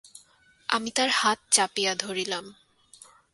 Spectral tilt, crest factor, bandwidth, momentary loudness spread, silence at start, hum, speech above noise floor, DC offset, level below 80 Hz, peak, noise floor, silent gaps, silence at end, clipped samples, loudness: -0.5 dB/octave; 24 dB; 12 kHz; 10 LU; 0.15 s; none; 34 dB; under 0.1%; -72 dBFS; -6 dBFS; -60 dBFS; none; 0.8 s; under 0.1%; -25 LUFS